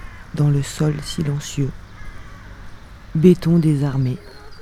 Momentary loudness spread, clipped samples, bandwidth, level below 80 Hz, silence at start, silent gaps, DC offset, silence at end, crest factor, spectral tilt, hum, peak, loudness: 25 LU; under 0.1%; 14 kHz; -40 dBFS; 0 s; none; 0.2%; 0 s; 20 dB; -7 dB/octave; none; 0 dBFS; -19 LUFS